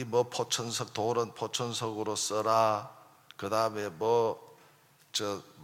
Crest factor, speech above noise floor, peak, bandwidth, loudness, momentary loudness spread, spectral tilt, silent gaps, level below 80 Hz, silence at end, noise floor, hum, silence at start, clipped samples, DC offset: 20 dB; 31 dB; -12 dBFS; 16.5 kHz; -31 LUFS; 9 LU; -3.5 dB/octave; none; -78 dBFS; 0 s; -62 dBFS; none; 0 s; under 0.1%; under 0.1%